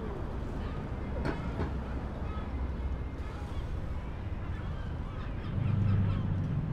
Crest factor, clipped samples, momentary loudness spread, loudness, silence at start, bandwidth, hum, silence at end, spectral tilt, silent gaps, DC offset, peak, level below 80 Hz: 14 dB; under 0.1%; 9 LU; -36 LUFS; 0 s; 7 kHz; none; 0 s; -8.5 dB/octave; none; under 0.1%; -18 dBFS; -38 dBFS